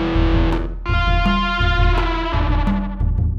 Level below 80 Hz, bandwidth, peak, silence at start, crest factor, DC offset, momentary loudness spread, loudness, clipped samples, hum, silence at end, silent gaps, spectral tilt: -20 dBFS; 6.4 kHz; -4 dBFS; 0 s; 14 dB; under 0.1%; 4 LU; -19 LUFS; under 0.1%; none; 0 s; none; -7.5 dB/octave